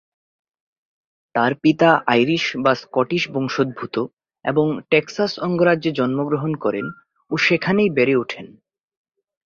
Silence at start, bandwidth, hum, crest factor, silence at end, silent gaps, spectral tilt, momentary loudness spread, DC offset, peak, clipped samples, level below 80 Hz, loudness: 1.35 s; 7.4 kHz; none; 18 dB; 0.95 s; 4.13-4.17 s; -6 dB/octave; 10 LU; under 0.1%; -2 dBFS; under 0.1%; -62 dBFS; -19 LUFS